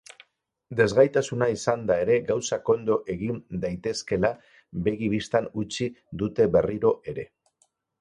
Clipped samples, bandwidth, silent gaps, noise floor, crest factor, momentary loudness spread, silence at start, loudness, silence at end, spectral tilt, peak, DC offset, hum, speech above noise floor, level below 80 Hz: under 0.1%; 11 kHz; none; -69 dBFS; 20 dB; 10 LU; 0.7 s; -25 LUFS; 0.75 s; -5.5 dB/octave; -6 dBFS; under 0.1%; none; 45 dB; -52 dBFS